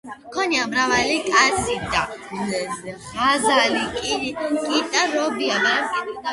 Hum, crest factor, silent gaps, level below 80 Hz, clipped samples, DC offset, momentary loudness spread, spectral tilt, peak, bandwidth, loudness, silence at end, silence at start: none; 20 dB; none; -50 dBFS; under 0.1%; under 0.1%; 10 LU; -2.5 dB/octave; -2 dBFS; 11.5 kHz; -20 LUFS; 0 s; 0.05 s